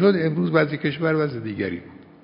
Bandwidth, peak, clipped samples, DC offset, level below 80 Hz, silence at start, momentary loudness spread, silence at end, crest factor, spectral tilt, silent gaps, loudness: 5.4 kHz; -4 dBFS; under 0.1%; under 0.1%; -56 dBFS; 0 s; 8 LU; 0.2 s; 18 dB; -12 dB/octave; none; -23 LUFS